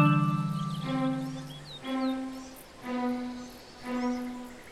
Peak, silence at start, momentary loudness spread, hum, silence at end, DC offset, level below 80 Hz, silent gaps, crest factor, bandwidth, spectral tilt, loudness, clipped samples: -12 dBFS; 0 s; 14 LU; none; 0 s; under 0.1%; -60 dBFS; none; 20 dB; 15 kHz; -7 dB/octave; -32 LUFS; under 0.1%